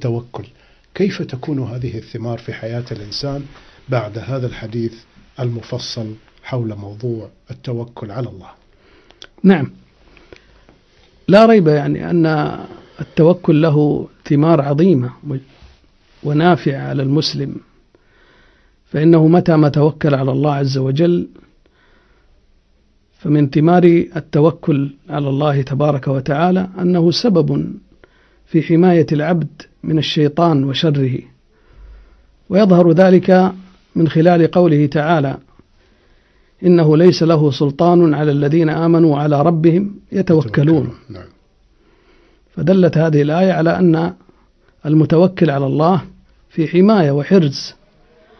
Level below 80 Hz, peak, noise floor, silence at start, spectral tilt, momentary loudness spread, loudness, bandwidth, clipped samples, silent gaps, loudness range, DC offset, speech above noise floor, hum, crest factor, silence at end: -48 dBFS; 0 dBFS; -55 dBFS; 0 s; -8 dB/octave; 16 LU; -14 LUFS; 6.4 kHz; under 0.1%; none; 11 LU; under 0.1%; 42 dB; none; 14 dB; 0.7 s